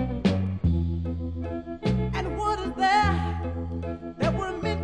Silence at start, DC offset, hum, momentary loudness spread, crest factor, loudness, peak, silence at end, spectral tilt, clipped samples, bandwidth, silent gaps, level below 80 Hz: 0 s; under 0.1%; none; 10 LU; 16 dB; -27 LUFS; -10 dBFS; 0 s; -7 dB/octave; under 0.1%; 9.8 kHz; none; -38 dBFS